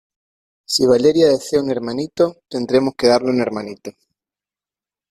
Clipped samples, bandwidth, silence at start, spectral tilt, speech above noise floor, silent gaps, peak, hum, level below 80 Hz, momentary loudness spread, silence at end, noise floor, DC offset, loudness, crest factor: under 0.1%; 15 kHz; 0.7 s; -4.5 dB/octave; over 73 dB; none; -2 dBFS; none; -56 dBFS; 14 LU; 1.2 s; under -90 dBFS; under 0.1%; -17 LUFS; 16 dB